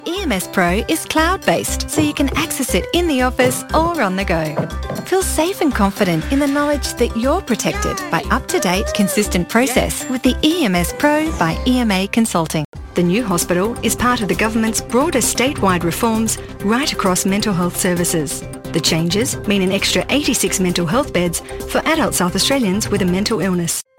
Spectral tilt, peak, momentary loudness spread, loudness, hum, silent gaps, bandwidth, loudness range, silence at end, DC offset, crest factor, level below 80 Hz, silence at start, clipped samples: -4 dB/octave; 0 dBFS; 4 LU; -17 LUFS; none; 12.65-12.73 s; 17 kHz; 1 LU; 0.15 s; under 0.1%; 16 dB; -32 dBFS; 0 s; under 0.1%